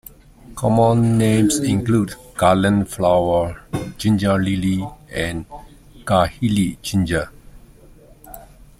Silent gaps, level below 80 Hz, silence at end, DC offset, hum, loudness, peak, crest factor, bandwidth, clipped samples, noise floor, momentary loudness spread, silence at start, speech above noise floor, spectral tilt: none; -42 dBFS; 0.35 s; under 0.1%; none; -19 LUFS; -2 dBFS; 18 dB; 16 kHz; under 0.1%; -46 dBFS; 13 LU; 0.5 s; 28 dB; -6 dB/octave